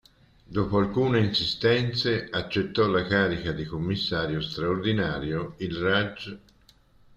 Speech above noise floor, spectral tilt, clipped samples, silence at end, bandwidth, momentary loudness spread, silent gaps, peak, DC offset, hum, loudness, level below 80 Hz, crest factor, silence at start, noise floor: 33 dB; -6.5 dB/octave; under 0.1%; 0.8 s; 9 kHz; 8 LU; none; -8 dBFS; under 0.1%; none; -26 LUFS; -50 dBFS; 18 dB; 0.5 s; -59 dBFS